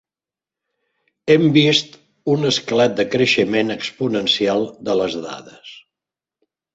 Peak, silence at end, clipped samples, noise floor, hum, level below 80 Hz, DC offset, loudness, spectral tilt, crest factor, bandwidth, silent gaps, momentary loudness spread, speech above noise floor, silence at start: -2 dBFS; 0.95 s; under 0.1%; -90 dBFS; none; -60 dBFS; under 0.1%; -17 LUFS; -5 dB/octave; 18 dB; 8 kHz; none; 16 LU; 72 dB; 1.25 s